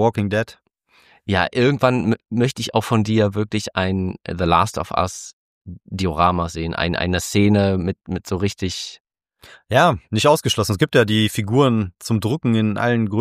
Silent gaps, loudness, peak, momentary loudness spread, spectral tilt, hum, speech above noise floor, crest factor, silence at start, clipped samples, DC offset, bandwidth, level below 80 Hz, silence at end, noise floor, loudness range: 5.33-5.65 s, 9.00-9.05 s; -19 LUFS; -2 dBFS; 9 LU; -5.5 dB/octave; none; 38 dB; 18 dB; 0 s; under 0.1%; under 0.1%; 15.5 kHz; -44 dBFS; 0 s; -57 dBFS; 3 LU